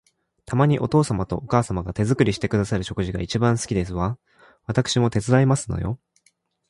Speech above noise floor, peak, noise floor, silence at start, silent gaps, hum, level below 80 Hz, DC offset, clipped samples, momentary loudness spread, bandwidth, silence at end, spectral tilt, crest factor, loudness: 44 dB; -4 dBFS; -65 dBFS; 0.5 s; none; none; -42 dBFS; under 0.1%; under 0.1%; 9 LU; 11.5 kHz; 0.75 s; -6 dB/octave; 18 dB; -22 LUFS